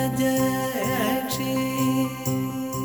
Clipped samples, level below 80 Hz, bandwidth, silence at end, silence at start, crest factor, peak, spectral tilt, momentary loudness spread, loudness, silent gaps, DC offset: under 0.1%; -52 dBFS; over 20 kHz; 0 s; 0 s; 14 dB; -10 dBFS; -5 dB/octave; 4 LU; -24 LUFS; none; under 0.1%